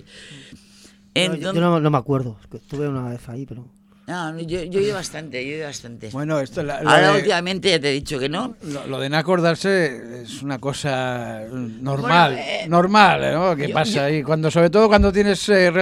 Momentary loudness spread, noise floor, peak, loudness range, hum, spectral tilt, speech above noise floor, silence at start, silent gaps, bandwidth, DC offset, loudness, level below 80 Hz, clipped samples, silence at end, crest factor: 17 LU; -49 dBFS; 0 dBFS; 10 LU; none; -5 dB/octave; 30 dB; 0.15 s; none; 13.5 kHz; under 0.1%; -19 LUFS; -40 dBFS; under 0.1%; 0 s; 20 dB